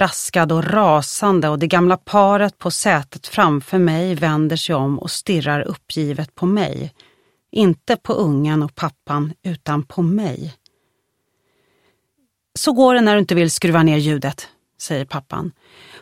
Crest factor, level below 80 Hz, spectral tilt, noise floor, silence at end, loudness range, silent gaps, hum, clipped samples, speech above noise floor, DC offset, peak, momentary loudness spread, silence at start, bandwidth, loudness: 18 dB; -56 dBFS; -5.5 dB/octave; -70 dBFS; 0.05 s; 7 LU; none; none; under 0.1%; 52 dB; under 0.1%; 0 dBFS; 12 LU; 0 s; 16 kHz; -18 LUFS